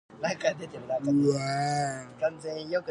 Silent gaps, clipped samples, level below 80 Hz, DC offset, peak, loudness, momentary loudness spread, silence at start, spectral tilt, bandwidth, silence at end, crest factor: none; under 0.1%; -66 dBFS; under 0.1%; -12 dBFS; -29 LUFS; 9 LU; 0.1 s; -5.5 dB/octave; 11 kHz; 0 s; 18 dB